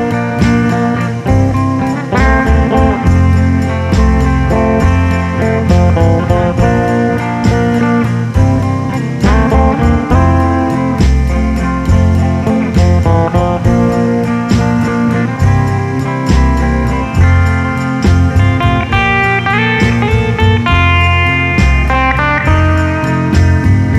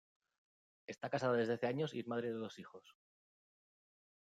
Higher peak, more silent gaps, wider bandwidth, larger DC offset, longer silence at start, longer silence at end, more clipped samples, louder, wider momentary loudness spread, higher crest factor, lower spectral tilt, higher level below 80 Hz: first, 0 dBFS vs -24 dBFS; neither; about the same, 10 kHz vs 9.2 kHz; neither; second, 0 s vs 0.9 s; second, 0 s vs 1.4 s; neither; first, -11 LUFS vs -40 LUFS; second, 4 LU vs 19 LU; second, 10 dB vs 18 dB; about the same, -7 dB/octave vs -6.5 dB/octave; first, -18 dBFS vs -86 dBFS